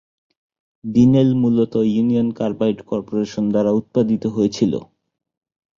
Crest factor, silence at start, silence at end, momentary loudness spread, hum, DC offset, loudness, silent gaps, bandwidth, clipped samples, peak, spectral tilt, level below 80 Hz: 16 dB; 0.85 s; 0.95 s; 9 LU; none; under 0.1%; -18 LUFS; none; 7.2 kHz; under 0.1%; -4 dBFS; -8 dB/octave; -52 dBFS